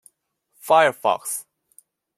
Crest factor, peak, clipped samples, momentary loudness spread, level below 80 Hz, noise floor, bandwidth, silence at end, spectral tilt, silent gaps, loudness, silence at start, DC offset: 20 dB; -4 dBFS; under 0.1%; 14 LU; -76 dBFS; -68 dBFS; 16 kHz; 0.75 s; -2 dB/octave; none; -20 LUFS; 0.65 s; under 0.1%